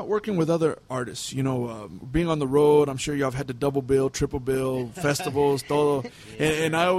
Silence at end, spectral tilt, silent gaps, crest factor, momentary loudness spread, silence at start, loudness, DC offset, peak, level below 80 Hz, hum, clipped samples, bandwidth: 0 s; -5.5 dB/octave; none; 16 dB; 9 LU; 0 s; -25 LUFS; under 0.1%; -8 dBFS; -46 dBFS; none; under 0.1%; 15 kHz